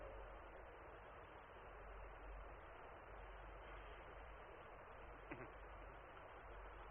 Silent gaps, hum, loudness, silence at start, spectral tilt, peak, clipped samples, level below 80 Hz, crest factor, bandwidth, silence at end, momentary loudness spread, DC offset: none; none; -58 LUFS; 0 s; -2 dB/octave; -36 dBFS; under 0.1%; -62 dBFS; 20 dB; 3.5 kHz; 0 s; 3 LU; under 0.1%